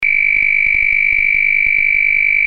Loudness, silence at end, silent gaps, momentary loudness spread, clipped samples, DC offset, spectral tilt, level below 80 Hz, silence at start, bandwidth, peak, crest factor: -11 LUFS; 0 s; none; 0 LU; under 0.1%; under 0.1%; 0 dB/octave; -38 dBFS; 0 s; 5.4 kHz; -4 dBFS; 10 dB